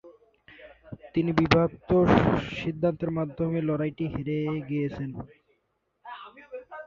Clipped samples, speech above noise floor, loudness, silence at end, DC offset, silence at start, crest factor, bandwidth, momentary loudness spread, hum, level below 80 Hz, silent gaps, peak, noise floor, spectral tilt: under 0.1%; 49 dB; -26 LUFS; 0 s; under 0.1%; 0.05 s; 26 dB; 7.2 kHz; 22 LU; none; -48 dBFS; none; -2 dBFS; -75 dBFS; -8 dB/octave